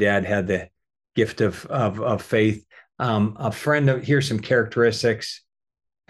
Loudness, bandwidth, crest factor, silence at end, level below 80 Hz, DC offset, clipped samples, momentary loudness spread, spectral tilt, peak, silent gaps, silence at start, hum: -22 LUFS; 12.5 kHz; 16 dB; 0.75 s; -56 dBFS; under 0.1%; under 0.1%; 8 LU; -6 dB/octave; -6 dBFS; none; 0 s; none